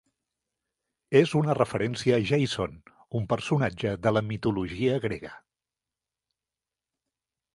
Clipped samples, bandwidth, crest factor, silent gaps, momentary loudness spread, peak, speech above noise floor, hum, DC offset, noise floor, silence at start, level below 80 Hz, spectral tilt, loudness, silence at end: under 0.1%; 11.5 kHz; 22 dB; none; 10 LU; -6 dBFS; over 64 dB; none; under 0.1%; under -90 dBFS; 1.1 s; -56 dBFS; -6.5 dB/octave; -27 LUFS; 2.15 s